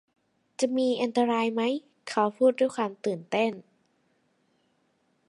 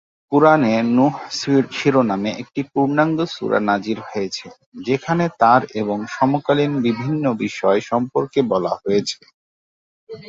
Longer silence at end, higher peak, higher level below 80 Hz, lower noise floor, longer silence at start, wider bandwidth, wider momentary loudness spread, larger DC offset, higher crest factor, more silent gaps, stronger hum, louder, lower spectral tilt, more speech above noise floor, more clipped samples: first, 1.7 s vs 0 s; second, -10 dBFS vs -2 dBFS; second, -82 dBFS vs -60 dBFS; second, -71 dBFS vs under -90 dBFS; first, 0.6 s vs 0.3 s; first, 11 kHz vs 7.8 kHz; about the same, 9 LU vs 10 LU; neither; about the same, 18 dB vs 18 dB; second, none vs 4.66-4.72 s, 9.34-10.07 s; neither; second, -27 LUFS vs -19 LUFS; second, -4.5 dB/octave vs -6 dB/octave; second, 45 dB vs over 72 dB; neither